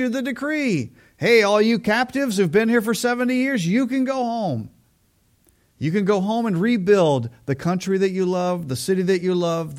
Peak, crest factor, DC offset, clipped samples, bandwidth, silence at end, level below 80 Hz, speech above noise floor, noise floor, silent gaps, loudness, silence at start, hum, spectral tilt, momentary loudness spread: -4 dBFS; 18 dB; under 0.1%; under 0.1%; 16.5 kHz; 0 s; -60 dBFS; 42 dB; -62 dBFS; none; -20 LUFS; 0 s; none; -6 dB/octave; 8 LU